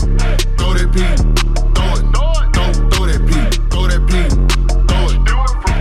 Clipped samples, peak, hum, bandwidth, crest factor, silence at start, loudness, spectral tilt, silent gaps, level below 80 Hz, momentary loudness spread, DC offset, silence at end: under 0.1%; -2 dBFS; none; 12 kHz; 10 dB; 0 s; -15 LUFS; -5 dB/octave; none; -12 dBFS; 2 LU; under 0.1%; 0 s